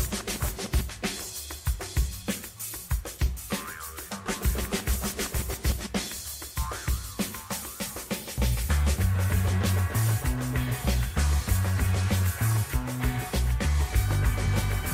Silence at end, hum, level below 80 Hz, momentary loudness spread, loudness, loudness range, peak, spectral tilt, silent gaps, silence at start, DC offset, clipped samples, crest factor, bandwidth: 0 s; none; -32 dBFS; 8 LU; -29 LUFS; 5 LU; -12 dBFS; -4.5 dB/octave; none; 0 s; under 0.1%; under 0.1%; 16 dB; 16 kHz